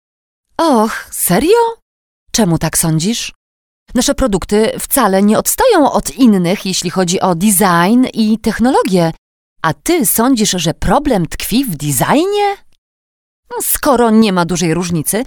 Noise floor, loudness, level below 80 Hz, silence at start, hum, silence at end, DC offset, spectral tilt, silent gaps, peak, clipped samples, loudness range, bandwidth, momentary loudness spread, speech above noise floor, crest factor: under -90 dBFS; -13 LUFS; -34 dBFS; 0.6 s; none; 0 s; under 0.1%; -4.5 dB/octave; 1.82-2.26 s, 3.35-3.86 s, 9.18-9.56 s, 12.78-13.43 s; 0 dBFS; under 0.1%; 3 LU; over 20 kHz; 7 LU; over 78 dB; 14 dB